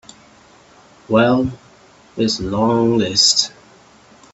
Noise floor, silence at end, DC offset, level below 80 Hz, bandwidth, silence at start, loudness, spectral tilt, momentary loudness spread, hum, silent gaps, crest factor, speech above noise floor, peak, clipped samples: -48 dBFS; 0.85 s; under 0.1%; -48 dBFS; 8.4 kHz; 1.1 s; -16 LUFS; -3.5 dB/octave; 12 LU; none; none; 18 dB; 32 dB; 0 dBFS; under 0.1%